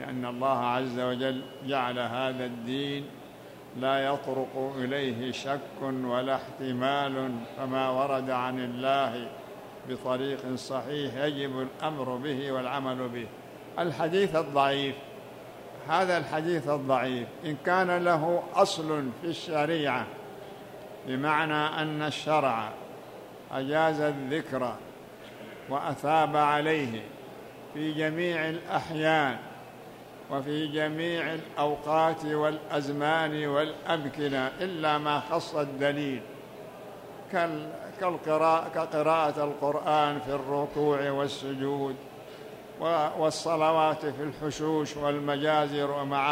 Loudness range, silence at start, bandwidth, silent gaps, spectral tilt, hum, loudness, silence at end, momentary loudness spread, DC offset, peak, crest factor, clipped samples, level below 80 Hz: 4 LU; 0 s; 16 kHz; none; -5.5 dB/octave; none; -29 LUFS; 0 s; 18 LU; under 0.1%; -8 dBFS; 22 dB; under 0.1%; -68 dBFS